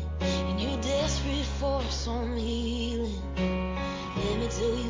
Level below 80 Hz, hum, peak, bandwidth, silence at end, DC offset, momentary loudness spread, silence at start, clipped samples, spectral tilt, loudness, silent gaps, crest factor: -34 dBFS; none; -16 dBFS; 7.6 kHz; 0 s; under 0.1%; 4 LU; 0 s; under 0.1%; -5 dB/octave; -30 LUFS; none; 12 dB